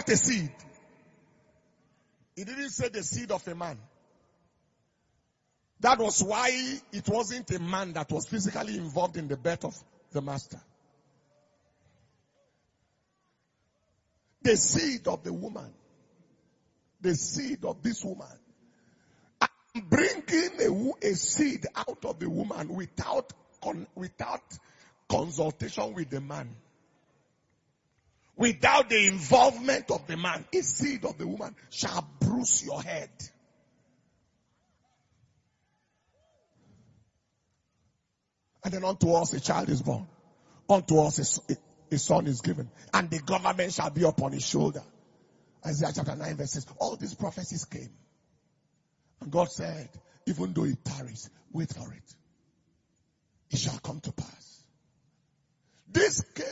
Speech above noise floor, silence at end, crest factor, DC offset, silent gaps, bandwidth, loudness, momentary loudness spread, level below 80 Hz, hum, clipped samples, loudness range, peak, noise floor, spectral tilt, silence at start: 50 dB; 0 s; 24 dB; under 0.1%; none; 8 kHz; -29 LUFS; 16 LU; -62 dBFS; none; under 0.1%; 11 LU; -6 dBFS; -79 dBFS; -4 dB/octave; 0 s